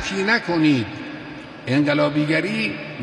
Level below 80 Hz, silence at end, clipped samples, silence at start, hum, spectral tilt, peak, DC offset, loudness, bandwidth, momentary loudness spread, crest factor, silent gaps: -54 dBFS; 0 s; under 0.1%; 0 s; none; -6 dB/octave; -6 dBFS; under 0.1%; -20 LUFS; 11 kHz; 15 LU; 16 dB; none